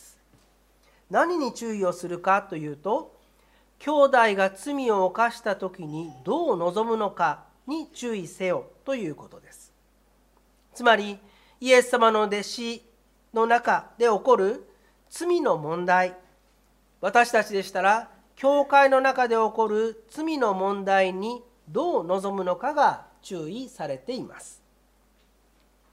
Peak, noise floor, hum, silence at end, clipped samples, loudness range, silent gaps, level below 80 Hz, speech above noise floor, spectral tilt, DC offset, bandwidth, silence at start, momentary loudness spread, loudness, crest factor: -4 dBFS; -62 dBFS; none; 1.4 s; under 0.1%; 7 LU; none; -66 dBFS; 38 dB; -4.5 dB/octave; under 0.1%; 15 kHz; 1.1 s; 15 LU; -24 LUFS; 22 dB